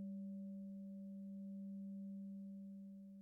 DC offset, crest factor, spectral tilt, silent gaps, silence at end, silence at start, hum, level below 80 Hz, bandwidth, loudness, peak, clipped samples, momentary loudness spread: under 0.1%; 8 dB; -13.5 dB/octave; none; 0 s; 0 s; none; -88 dBFS; 0.7 kHz; -52 LUFS; -44 dBFS; under 0.1%; 4 LU